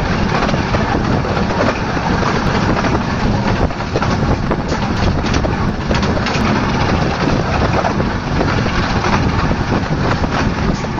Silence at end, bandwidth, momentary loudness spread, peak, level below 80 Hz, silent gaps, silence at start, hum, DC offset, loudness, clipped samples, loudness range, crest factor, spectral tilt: 0 s; 8 kHz; 3 LU; 0 dBFS; -24 dBFS; none; 0 s; none; 0.3%; -16 LUFS; under 0.1%; 1 LU; 14 dB; -6 dB/octave